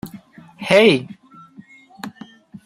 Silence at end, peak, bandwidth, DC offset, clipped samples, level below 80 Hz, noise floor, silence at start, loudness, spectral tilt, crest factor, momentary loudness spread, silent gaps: 0.55 s; -2 dBFS; 16 kHz; under 0.1%; under 0.1%; -62 dBFS; -45 dBFS; 0.05 s; -15 LUFS; -5 dB/octave; 20 dB; 24 LU; none